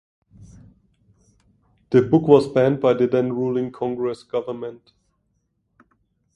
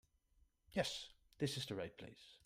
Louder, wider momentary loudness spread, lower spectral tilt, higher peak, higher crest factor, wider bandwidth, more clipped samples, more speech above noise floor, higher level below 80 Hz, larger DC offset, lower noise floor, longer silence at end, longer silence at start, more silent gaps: first, -20 LUFS vs -44 LUFS; second, 12 LU vs 15 LU; first, -8.5 dB/octave vs -4.5 dB/octave; first, 0 dBFS vs -24 dBFS; about the same, 22 dB vs 22 dB; second, 10.5 kHz vs 15.5 kHz; neither; first, 51 dB vs 32 dB; first, -58 dBFS vs -72 dBFS; neither; second, -70 dBFS vs -76 dBFS; first, 1.6 s vs 0.1 s; second, 0.4 s vs 0.7 s; neither